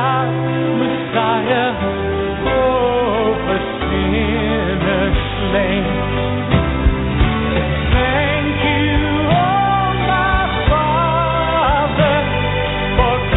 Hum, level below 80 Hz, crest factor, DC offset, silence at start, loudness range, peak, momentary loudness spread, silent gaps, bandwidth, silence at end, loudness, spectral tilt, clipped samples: none; -24 dBFS; 16 dB; under 0.1%; 0 s; 2 LU; 0 dBFS; 4 LU; none; 4.1 kHz; 0 s; -16 LUFS; -12 dB/octave; under 0.1%